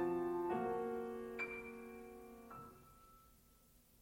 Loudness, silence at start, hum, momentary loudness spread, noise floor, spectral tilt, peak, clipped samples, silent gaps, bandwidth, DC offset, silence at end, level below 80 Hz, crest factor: -44 LUFS; 0 s; none; 23 LU; -69 dBFS; -7 dB/octave; -28 dBFS; under 0.1%; none; 16.5 kHz; under 0.1%; 0.65 s; -70 dBFS; 16 dB